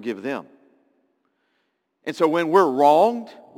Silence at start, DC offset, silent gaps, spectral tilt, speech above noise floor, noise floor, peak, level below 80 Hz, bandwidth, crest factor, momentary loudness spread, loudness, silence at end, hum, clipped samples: 0 s; under 0.1%; none; -6 dB/octave; 52 dB; -72 dBFS; -2 dBFS; -82 dBFS; 17 kHz; 20 dB; 17 LU; -19 LUFS; 0.25 s; none; under 0.1%